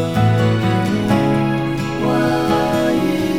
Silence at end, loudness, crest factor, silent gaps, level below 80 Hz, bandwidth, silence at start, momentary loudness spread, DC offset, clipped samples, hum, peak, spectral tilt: 0 s; -17 LUFS; 12 dB; none; -42 dBFS; 16 kHz; 0 s; 4 LU; 0.7%; under 0.1%; none; -4 dBFS; -7 dB/octave